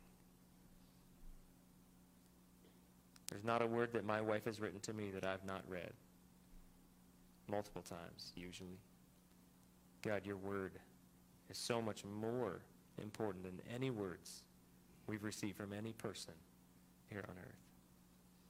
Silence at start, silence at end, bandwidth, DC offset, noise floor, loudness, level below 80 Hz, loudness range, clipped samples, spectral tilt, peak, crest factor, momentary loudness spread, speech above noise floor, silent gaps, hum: 0 s; 0 s; 16 kHz; under 0.1%; -68 dBFS; -46 LUFS; -72 dBFS; 10 LU; under 0.1%; -5 dB/octave; -20 dBFS; 28 dB; 26 LU; 23 dB; none; 60 Hz at -70 dBFS